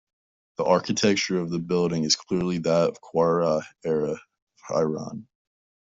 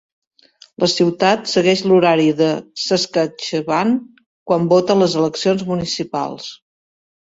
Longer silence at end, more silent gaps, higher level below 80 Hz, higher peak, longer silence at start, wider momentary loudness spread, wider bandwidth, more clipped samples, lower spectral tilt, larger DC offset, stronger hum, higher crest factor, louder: about the same, 0.6 s vs 0.65 s; second, 4.42-4.47 s vs 4.26-4.46 s; about the same, -62 dBFS vs -58 dBFS; second, -6 dBFS vs 0 dBFS; second, 0.6 s vs 0.8 s; about the same, 10 LU vs 9 LU; about the same, 8 kHz vs 8 kHz; neither; about the same, -4.5 dB/octave vs -5 dB/octave; neither; neither; about the same, 20 dB vs 16 dB; second, -24 LUFS vs -17 LUFS